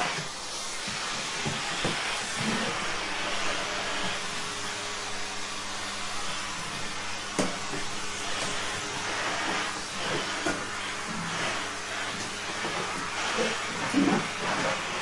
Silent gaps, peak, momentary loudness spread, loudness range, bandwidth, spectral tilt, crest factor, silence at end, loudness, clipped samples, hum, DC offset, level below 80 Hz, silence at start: none; -12 dBFS; 5 LU; 3 LU; 11.5 kHz; -2.5 dB/octave; 20 dB; 0 s; -30 LUFS; under 0.1%; none; under 0.1%; -52 dBFS; 0 s